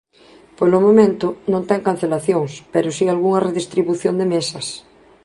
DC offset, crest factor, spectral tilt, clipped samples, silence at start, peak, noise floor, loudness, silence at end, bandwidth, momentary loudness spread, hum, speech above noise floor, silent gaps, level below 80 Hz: under 0.1%; 16 dB; -6 dB/octave; under 0.1%; 0.6 s; -2 dBFS; -48 dBFS; -18 LUFS; 0.45 s; 11.5 kHz; 10 LU; none; 31 dB; none; -60 dBFS